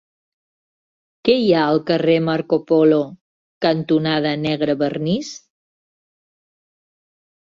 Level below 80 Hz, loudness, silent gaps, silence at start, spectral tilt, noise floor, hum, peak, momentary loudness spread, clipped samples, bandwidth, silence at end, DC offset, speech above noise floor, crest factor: -60 dBFS; -18 LUFS; 3.21-3.61 s; 1.25 s; -6.5 dB/octave; under -90 dBFS; none; -4 dBFS; 8 LU; under 0.1%; 7.4 kHz; 2.2 s; under 0.1%; over 73 dB; 16 dB